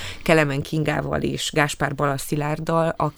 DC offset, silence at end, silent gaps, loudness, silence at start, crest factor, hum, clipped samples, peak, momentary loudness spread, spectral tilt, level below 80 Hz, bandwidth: under 0.1%; 0.05 s; none; -22 LUFS; 0 s; 20 dB; none; under 0.1%; -2 dBFS; 6 LU; -5 dB/octave; -44 dBFS; over 20 kHz